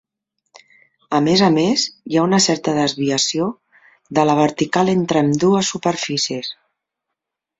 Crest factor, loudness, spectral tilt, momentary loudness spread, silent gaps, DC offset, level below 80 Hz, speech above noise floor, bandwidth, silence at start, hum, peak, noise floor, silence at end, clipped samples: 18 dB; -17 LUFS; -4.5 dB/octave; 8 LU; none; under 0.1%; -58 dBFS; 64 dB; 8 kHz; 1.1 s; none; -2 dBFS; -81 dBFS; 1.05 s; under 0.1%